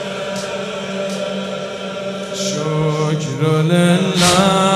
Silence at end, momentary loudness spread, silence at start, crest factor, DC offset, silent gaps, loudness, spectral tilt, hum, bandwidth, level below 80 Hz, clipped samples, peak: 0 s; 12 LU; 0 s; 18 dB; under 0.1%; none; -17 LUFS; -5 dB/octave; none; 14.5 kHz; -50 dBFS; under 0.1%; 0 dBFS